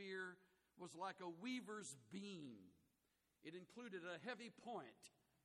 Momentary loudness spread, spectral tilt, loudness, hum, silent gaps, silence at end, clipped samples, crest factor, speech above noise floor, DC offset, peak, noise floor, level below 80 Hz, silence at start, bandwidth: 12 LU; -4 dB/octave; -54 LUFS; none; none; 0.35 s; under 0.1%; 18 dB; 32 dB; under 0.1%; -38 dBFS; -86 dBFS; under -90 dBFS; 0 s; 13 kHz